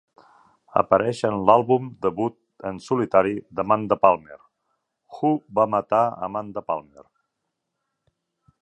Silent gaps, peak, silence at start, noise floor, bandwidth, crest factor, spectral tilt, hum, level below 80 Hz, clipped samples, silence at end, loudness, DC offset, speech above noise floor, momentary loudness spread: none; -2 dBFS; 0.75 s; -80 dBFS; 10.5 kHz; 22 dB; -7.5 dB/octave; none; -60 dBFS; under 0.1%; 1.85 s; -22 LUFS; under 0.1%; 58 dB; 12 LU